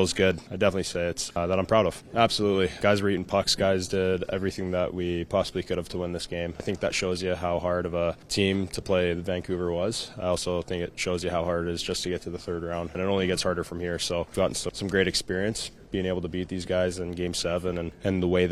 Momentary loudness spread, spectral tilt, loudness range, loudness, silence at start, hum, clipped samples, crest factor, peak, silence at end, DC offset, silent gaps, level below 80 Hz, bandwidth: 8 LU; -4.5 dB/octave; 4 LU; -27 LUFS; 0 s; none; under 0.1%; 22 dB; -4 dBFS; 0 s; under 0.1%; none; -48 dBFS; 14 kHz